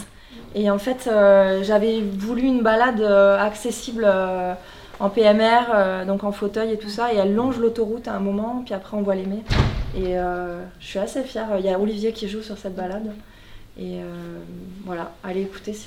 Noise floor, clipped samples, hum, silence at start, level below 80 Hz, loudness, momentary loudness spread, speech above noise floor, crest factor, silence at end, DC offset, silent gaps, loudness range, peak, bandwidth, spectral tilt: -42 dBFS; under 0.1%; none; 0 s; -38 dBFS; -21 LUFS; 17 LU; 21 dB; 18 dB; 0 s; under 0.1%; none; 10 LU; -4 dBFS; 15.5 kHz; -6 dB/octave